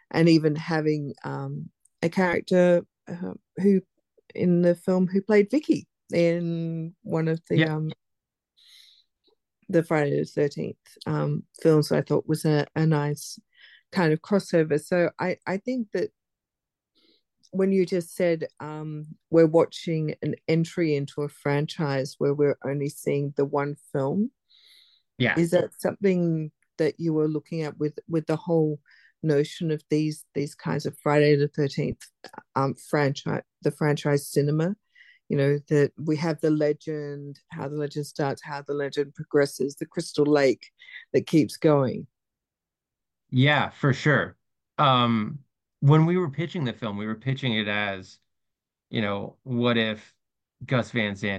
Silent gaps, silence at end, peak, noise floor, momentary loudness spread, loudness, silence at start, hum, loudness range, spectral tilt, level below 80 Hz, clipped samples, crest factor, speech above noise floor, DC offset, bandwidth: none; 0 s; -6 dBFS; -89 dBFS; 12 LU; -25 LUFS; 0.15 s; none; 5 LU; -7 dB/octave; -68 dBFS; under 0.1%; 18 dB; 64 dB; under 0.1%; 12.5 kHz